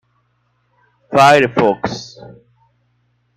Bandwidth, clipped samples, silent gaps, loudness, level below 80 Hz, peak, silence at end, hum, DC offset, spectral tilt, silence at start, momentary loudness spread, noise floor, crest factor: 15.5 kHz; under 0.1%; none; -13 LUFS; -54 dBFS; 0 dBFS; 1.3 s; 60 Hz at -40 dBFS; under 0.1%; -5 dB/octave; 1.1 s; 19 LU; -63 dBFS; 18 dB